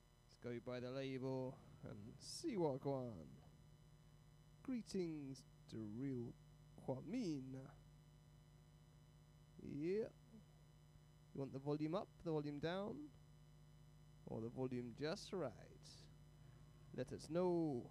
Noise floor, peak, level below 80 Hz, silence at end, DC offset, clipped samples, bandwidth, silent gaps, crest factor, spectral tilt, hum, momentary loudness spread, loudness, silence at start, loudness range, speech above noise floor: -67 dBFS; -30 dBFS; -72 dBFS; 0 s; under 0.1%; under 0.1%; 14.5 kHz; none; 20 dB; -6.5 dB/octave; 50 Hz at -70 dBFS; 24 LU; -48 LUFS; 0.1 s; 5 LU; 20 dB